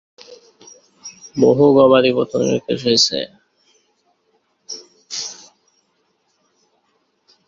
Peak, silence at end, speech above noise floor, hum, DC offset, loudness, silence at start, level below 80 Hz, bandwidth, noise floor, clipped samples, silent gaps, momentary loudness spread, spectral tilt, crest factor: -2 dBFS; 2.15 s; 51 dB; none; under 0.1%; -15 LUFS; 0.3 s; -60 dBFS; 7.8 kHz; -65 dBFS; under 0.1%; none; 23 LU; -4.5 dB/octave; 18 dB